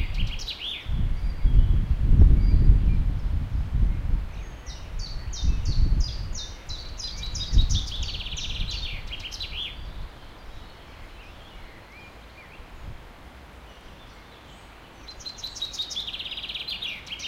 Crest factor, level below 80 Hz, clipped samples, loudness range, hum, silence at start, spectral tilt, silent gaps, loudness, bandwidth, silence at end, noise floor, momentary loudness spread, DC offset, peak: 22 dB; -26 dBFS; under 0.1%; 21 LU; none; 0 s; -4.5 dB/octave; none; -28 LUFS; 7.6 kHz; 0 s; -46 dBFS; 23 LU; under 0.1%; -4 dBFS